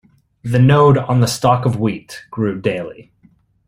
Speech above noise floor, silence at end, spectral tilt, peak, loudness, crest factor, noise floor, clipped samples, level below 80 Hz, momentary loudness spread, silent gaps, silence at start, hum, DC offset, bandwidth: 39 dB; 0.65 s; -6.5 dB/octave; 0 dBFS; -15 LUFS; 16 dB; -54 dBFS; under 0.1%; -48 dBFS; 19 LU; none; 0.45 s; none; under 0.1%; 16 kHz